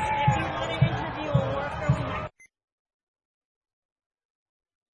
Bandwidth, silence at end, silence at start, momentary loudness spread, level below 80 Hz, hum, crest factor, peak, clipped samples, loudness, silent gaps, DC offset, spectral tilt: 10 kHz; 2.5 s; 0 s; 8 LU; -46 dBFS; none; 22 dB; -8 dBFS; under 0.1%; -27 LUFS; none; under 0.1%; -6.5 dB/octave